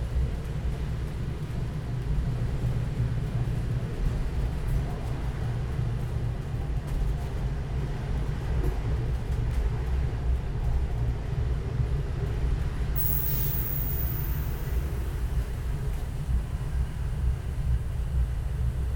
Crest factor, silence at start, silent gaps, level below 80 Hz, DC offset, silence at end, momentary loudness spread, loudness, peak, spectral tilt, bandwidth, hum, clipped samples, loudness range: 14 dB; 0 s; none; -30 dBFS; under 0.1%; 0 s; 5 LU; -30 LUFS; -14 dBFS; -7 dB/octave; 18 kHz; none; under 0.1%; 4 LU